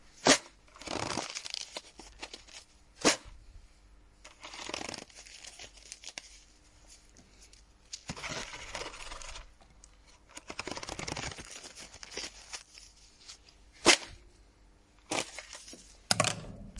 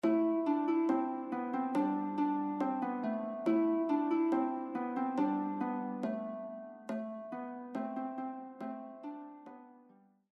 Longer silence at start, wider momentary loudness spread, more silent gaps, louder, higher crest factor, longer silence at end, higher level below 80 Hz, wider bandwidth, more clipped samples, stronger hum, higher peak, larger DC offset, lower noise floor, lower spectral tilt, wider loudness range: about the same, 0.05 s vs 0.05 s; first, 24 LU vs 14 LU; neither; about the same, -33 LUFS vs -35 LUFS; first, 30 dB vs 16 dB; second, 0 s vs 0.55 s; first, -58 dBFS vs -86 dBFS; first, 11.5 kHz vs 6 kHz; neither; neither; first, -6 dBFS vs -20 dBFS; neither; about the same, -61 dBFS vs -64 dBFS; second, -1.5 dB/octave vs -8 dB/octave; first, 13 LU vs 9 LU